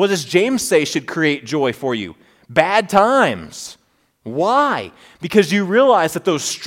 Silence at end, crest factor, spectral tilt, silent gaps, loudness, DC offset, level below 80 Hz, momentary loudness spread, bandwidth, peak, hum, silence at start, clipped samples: 0 s; 18 dB; -4 dB/octave; none; -16 LUFS; under 0.1%; -58 dBFS; 18 LU; 17 kHz; 0 dBFS; none; 0 s; under 0.1%